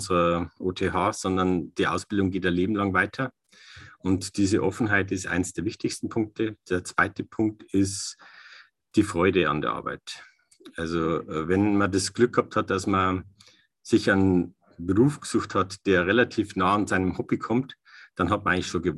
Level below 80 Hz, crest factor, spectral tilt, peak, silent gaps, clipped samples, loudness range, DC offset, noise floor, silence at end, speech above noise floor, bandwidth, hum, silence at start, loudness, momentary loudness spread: -48 dBFS; 18 dB; -5.5 dB/octave; -6 dBFS; none; under 0.1%; 3 LU; under 0.1%; -58 dBFS; 0 s; 33 dB; 12.5 kHz; none; 0 s; -25 LUFS; 10 LU